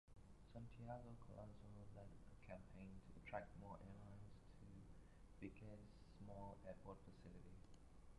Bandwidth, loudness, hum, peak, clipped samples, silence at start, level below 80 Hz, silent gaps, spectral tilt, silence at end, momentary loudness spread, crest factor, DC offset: 11 kHz; -61 LUFS; none; -36 dBFS; under 0.1%; 0.05 s; -68 dBFS; none; -7.5 dB/octave; 0 s; 10 LU; 22 dB; under 0.1%